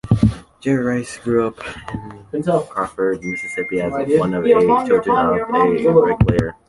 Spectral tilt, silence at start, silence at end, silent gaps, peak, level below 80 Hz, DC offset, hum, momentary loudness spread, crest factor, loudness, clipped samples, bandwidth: -7.5 dB/octave; 0.05 s; 0.15 s; none; -2 dBFS; -36 dBFS; under 0.1%; none; 12 LU; 16 dB; -18 LUFS; under 0.1%; 11.5 kHz